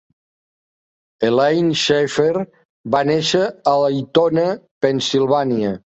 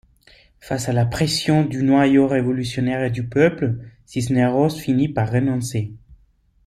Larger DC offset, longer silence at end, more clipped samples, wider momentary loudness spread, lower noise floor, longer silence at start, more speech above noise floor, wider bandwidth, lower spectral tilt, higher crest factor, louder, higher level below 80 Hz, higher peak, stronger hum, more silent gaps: neither; second, 0.2 s vs 0.5 s; neither; second, 6 LU vs 10 LU; first, under -90 dBFS vs -58 dBFS; first, 1.2 s vs 0.65 s; first, over 73 dB vs 39 dB; second, 8.2 kHz vs 14 kHz; second, -5 dB/octave vs -6.5 dB/octave; about the same, 16 dB vs 16 dB; first, -17 LUFS vs -20 LUFS; second, -58 dBFS vs -48 dBFS; about the same, -2 dBFS vs -4 dBFS; neither; first, 2.65-2.84 s, 4.71-4.81 s vs none